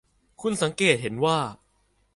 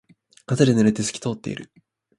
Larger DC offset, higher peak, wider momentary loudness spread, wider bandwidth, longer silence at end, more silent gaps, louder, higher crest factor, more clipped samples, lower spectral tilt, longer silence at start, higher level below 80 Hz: neither; second, -6 dBFS vs -2 dBFS; second, 10 LU vs 15 LU; about the same, 11.5 kHz vs 11.5 kHz; about the same, 0.6 s vs 0.55 s; neither; second, -25 LUFS vs -21 LUFS; about the same, 22 dB vs 22 dB; neither; second, -4 dB/octave vs -5.5 dB/octave; about the same, 0.4 s vs 0.5 s; about the same, -60 dBFS vs -56 dBFS